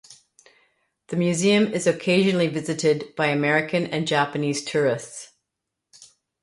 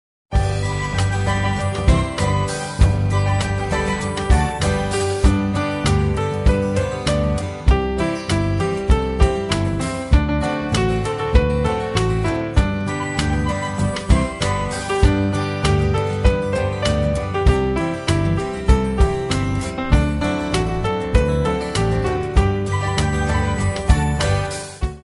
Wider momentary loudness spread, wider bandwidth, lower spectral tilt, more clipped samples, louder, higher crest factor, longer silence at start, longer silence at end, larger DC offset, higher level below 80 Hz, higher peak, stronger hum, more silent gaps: about the same, 6 LU vs 4 LU; about the same, 11.5 kHz vs 11.5 kHz; about the same, -5 dB/octave vs -6 dB/octave; neither; about the same, -22 LUFS vs -20 LUFS; about the same, 18 dB vs 18 dB; second, 0.1 s vs 0.3 s; first, 0.4 s vs 0.05 s; neither; second, -66 dBFS vs -22 dBFS; second, -6 dBFS vs 0 dBFS; neither; neither